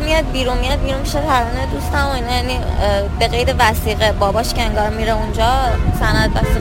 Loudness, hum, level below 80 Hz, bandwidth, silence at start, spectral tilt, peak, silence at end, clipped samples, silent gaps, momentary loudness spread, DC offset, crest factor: -17 LUFS; none; -20 dBFS; 17 kHz; 0 s; -5 dB/octave; 0 dBFS; 0 s; under 0.1%; none; 4 LU; under 0.1%; 16 dB